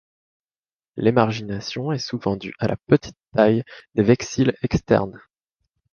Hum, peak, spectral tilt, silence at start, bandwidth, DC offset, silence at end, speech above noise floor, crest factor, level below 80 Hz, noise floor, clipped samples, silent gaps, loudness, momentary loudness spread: none; -2 dBFS; -6.5 dB/octave; 0.95 s; 7 kHz; under 0.1%; 0.75 s; over 69 dB; 20 dB; -48 dBFS; under -90 dBFS; under 0.1%; none; -22 LUFS; 9 LU